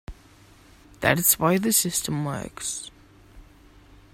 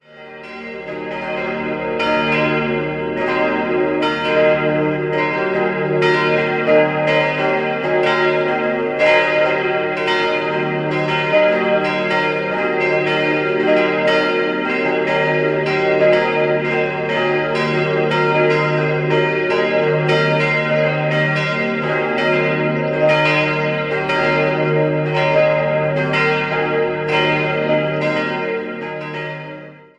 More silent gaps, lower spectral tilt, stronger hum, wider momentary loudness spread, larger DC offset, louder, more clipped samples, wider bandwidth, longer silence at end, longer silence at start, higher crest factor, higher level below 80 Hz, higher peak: neither; second, -3.5 dB/octave vs -6.5 dB/octave; neither; first, 12 LU vs 7 LU; neither; second, -23 LUFS vs -17 LUFS; neither; first, 16.5 kHz vs 10 kHz; first, 0.7 s vs 0.2 s; about the same, 0.1 s vs 0.1 s; first, 24 dB vs 16 dB; about the same, -50 dBFS vs -52 dBFS; about the same, -2 dBFS vs 0 dBFS